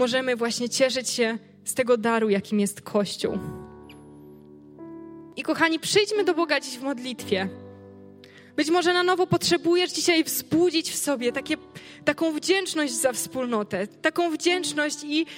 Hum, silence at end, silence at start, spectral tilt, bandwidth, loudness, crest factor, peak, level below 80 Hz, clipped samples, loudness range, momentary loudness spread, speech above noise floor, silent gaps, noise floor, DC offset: none; 0 s; 0 s; -3 dB/octave; 16.5 kHz; -24 LUFS; 20 dB; -6 dBFS; -64 dBFS; under 0.1%; 4 LU; 12 LU; 24 dB; none; -49 dBFS; under 0.1%